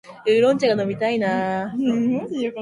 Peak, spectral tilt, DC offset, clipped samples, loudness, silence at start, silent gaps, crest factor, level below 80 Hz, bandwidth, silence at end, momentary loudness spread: -6 dBFS; -6 dB/octave; under 0.1%; under 0.1%; -21 LUFS; 0.05 s; none; 14 dB; -62 dBFS; 10.5 kHz; 0 s; 7 LU